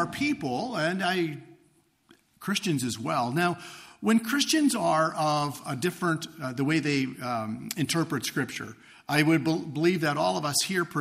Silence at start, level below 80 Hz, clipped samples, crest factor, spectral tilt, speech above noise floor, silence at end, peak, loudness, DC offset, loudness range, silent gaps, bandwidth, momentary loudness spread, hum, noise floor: 0 s; -68 dBFS; under 0.1%; 20 dB; -4.5 dB/octave; 38 dB; 0 s; -8 dBFS; -27 LUFS; under 0.1%; 4 LU; none; 15.5 kHz; 10 LU; none; -65 dBFS